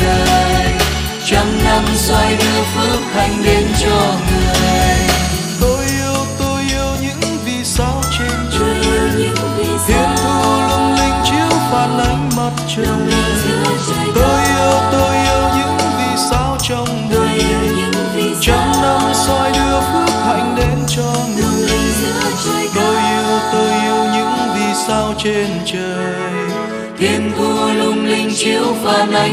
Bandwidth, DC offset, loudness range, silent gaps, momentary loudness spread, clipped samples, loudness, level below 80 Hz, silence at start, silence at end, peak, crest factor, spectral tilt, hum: 15.5 kHz; under 0.1%; 3 LU; none; 5 LU; under 0.1%; -14 LUFS; -26 dBFS; 0 s; 0 s; 0 dBFS; 14 dB; -4 dB/octave; none